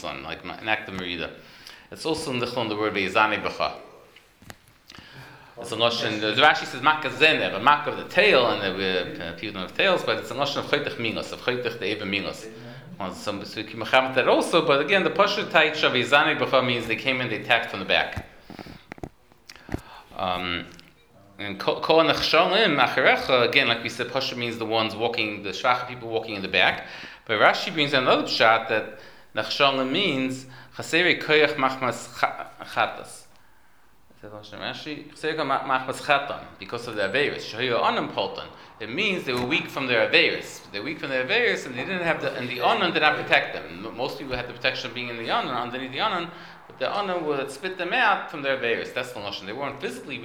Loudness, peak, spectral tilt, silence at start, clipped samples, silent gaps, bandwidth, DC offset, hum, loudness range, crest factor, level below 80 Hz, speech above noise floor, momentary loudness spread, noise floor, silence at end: -23 LUFS; 0 dBFS; -4 dB/octave; 0 s; under 0.1%; none; over 20 kHz; 0.1%; none; 8 LU; 24 dB; -58 dBFS; 35 dB; 17 LU; -60 dBFS; 0 s